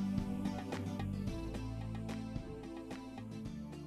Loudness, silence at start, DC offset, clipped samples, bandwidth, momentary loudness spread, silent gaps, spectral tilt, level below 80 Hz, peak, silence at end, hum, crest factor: -42 LUFS; 0 s; under 0.1%; under 0.1%; 14 kHz; 8 LU; none; -7 dB/octave; -52 dBFS; -24 dBFS; 0 s; none; 18 dB